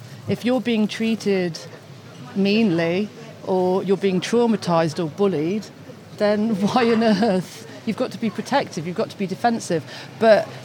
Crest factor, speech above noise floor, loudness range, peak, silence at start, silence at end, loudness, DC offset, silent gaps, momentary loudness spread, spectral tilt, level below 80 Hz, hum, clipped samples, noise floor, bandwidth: 18 dB; 19 dB; 2 LU; -4 dBFS; 0 s; 0 s; -21 LUFS; under 0.1%; none; 16 LU; -6 dB/octave; -80 dBFS; none; under 0.1%; -39 dBFS; 16 kHz